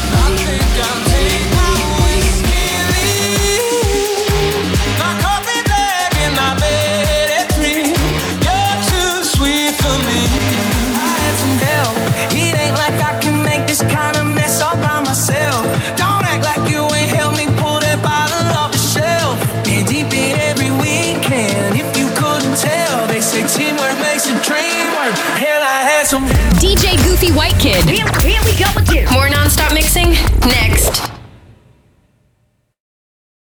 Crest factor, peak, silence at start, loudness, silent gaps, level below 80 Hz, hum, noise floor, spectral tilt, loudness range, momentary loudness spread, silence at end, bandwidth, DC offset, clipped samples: 12 dB; -2 dBFS; 0 s; -13 LUFS; none; -22 dBFS; none; -60 dBFS; -4 dB/octave; 3 LU; 4 LU; 2.3 s; over 20 kHz; under 0.1%; under 0.1%